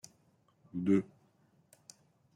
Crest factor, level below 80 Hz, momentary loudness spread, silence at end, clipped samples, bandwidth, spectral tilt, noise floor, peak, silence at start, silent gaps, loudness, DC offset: 22 dB; -78 dBFS; 26 LU; 1.35 s; under 0.1%; 15 kHz; -7.5 dB/octave; -70 dBFS; -16 dBFS; 0.75 s; none; -33 LUFS; under 0.1%